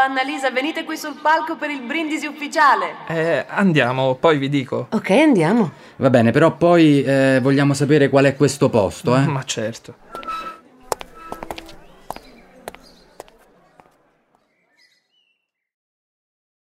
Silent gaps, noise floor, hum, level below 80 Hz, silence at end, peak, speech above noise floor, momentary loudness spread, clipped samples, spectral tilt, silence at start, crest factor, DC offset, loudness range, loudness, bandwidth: none; -71 dBFS; none; -54 dBFS; 4 s; 0 dBFS; 54 dB; 21 LU; under 0.1%; -6 dB/octave; 0 s; 18 dB; under 0.1%; 18 LU; -17 LUFS; 15 kHz